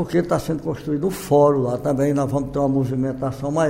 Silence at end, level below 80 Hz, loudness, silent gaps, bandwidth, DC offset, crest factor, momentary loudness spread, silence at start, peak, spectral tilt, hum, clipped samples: 0 s; -44 dBFS; -21 LUFS; none; 16 kHz; under 0.1%; 16 dB; 9 LU; 0 s; -4 dBFS; -7.5 dB/octave; none; under 0.1%